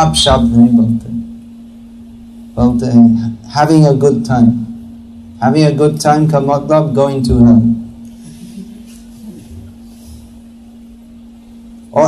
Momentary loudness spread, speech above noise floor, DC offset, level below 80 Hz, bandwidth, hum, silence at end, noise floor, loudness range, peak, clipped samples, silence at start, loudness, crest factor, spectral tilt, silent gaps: 24 LU; 27 dB; under 0.1%; -32 dBFS; 13 kHz; none; 0 s; -36 dBFS; 4 LU; 0 dBFS; under 0.1%; 0 s; -11 LUFS; 12 dB; -6.5 dB/octave; none